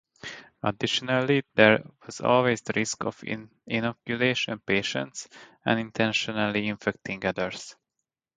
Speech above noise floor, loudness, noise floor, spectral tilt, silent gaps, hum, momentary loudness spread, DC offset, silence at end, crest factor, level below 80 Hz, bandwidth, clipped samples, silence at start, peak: 58 dB; -26 LUFS; -85 dBFS; -4.5 dB/octave; none; none; 16 LU; under 0.1%; 0.65 s; 26 dB; -62 dBFS; 9.6 kHz; under 0.1%; 0.25 s; 0 dBFS